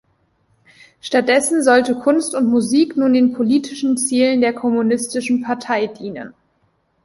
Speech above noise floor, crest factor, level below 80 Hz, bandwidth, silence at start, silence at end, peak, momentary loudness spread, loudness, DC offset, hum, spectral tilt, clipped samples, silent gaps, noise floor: 47 dB; 16 dB; -60 dBFS; 11.5 kHz; 1.05 s; 0.75 s; -2 dBFS; 9 LU; -17 LUFS; under 0.1%; none; -3.5 dB/octave; under 0.1%; none; -63 dBFS